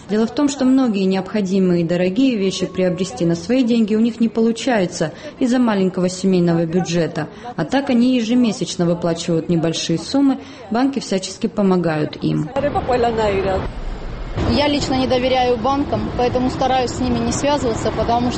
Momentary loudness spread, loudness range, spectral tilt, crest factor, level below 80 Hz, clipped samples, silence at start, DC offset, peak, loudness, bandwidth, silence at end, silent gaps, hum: 6 LU; 2 LU; -6 dB/octave; 14 dB; -36 dBFS; under 0.1%; 0 s; under 0.1%; -4 dBFS; -18 LUFS; 8.8 kHz; 0 s; none; none